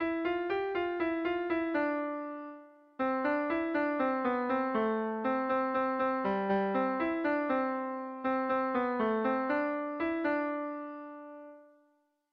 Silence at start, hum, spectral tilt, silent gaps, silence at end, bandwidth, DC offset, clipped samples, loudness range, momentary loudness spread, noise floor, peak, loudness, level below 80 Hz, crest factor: 0 s; none; -4 dB/octave; none; 0.7 s; 5.8 kHz; under 0.1%; under 0.1%; 2 LU; 10 LU; -72 dBFS; -18 dBFS; -32 LUFS; -68 dBFS; 14 dB